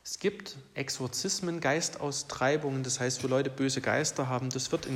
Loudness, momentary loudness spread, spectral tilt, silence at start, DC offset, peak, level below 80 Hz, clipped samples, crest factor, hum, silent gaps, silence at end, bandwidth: -31 LUFS; 6 LU; -3.5 dB/octave; 0.05 s; under 0.1%; -14 dBFS; -66 dBFS; under 0.1%; 16 dB; none; none; 0 s; 16 kHz